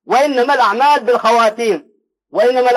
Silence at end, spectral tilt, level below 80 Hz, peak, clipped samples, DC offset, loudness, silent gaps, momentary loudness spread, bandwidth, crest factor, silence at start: 0 s; -3 dB/octave; -68 dBFS; -4 dBFS; under 0.1%; under 0.1%; -13 LUFS; none; 7 LU; 16 kHz; 10 dB; 0.1 s